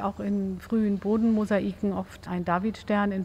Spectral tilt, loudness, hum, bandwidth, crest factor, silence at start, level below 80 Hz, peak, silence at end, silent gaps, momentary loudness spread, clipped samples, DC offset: -8 dB/octave; -27 LUFS; none; 8.8 kHz; 14 dB; 0 s; -52 dBFS; -12 dBFS; 0 s; none; 7 LU; under 0.1%; under 0.1%